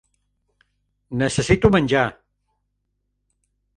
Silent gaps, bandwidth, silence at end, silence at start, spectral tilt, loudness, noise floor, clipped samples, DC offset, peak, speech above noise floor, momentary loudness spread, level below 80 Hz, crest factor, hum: none; 11 kHz; 1.65 s; 1.1 s; -5.5 dB/octave; -19 LUFS; -73 dBFS; under 0.1%; under 0.1%; 0 dBFS; 55 dB; 9 LU; -42 dBFS; 24 dB; 50 Hz at -45 dBFS